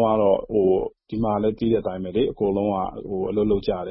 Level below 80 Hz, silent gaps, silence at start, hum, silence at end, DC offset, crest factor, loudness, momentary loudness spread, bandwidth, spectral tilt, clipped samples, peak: -44 dBFS; none; 0 s; none; 0 s; under 0.1%; 16 dB; -23 LUFS; 7 LU; 5.8 kHz; -12 dB/octave; under 0.1%; -6 dBFS